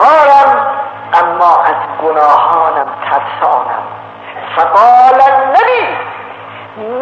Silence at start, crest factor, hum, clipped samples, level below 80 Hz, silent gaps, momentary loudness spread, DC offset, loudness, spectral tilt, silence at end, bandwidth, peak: 0 s; 10 dB; none; 0.5%; -60 dBFS; none; 20 LU; under 0.1%; -9 LUFS; -4.5 dB/octave; 0 s; 7.4 kHz; 0 dBFS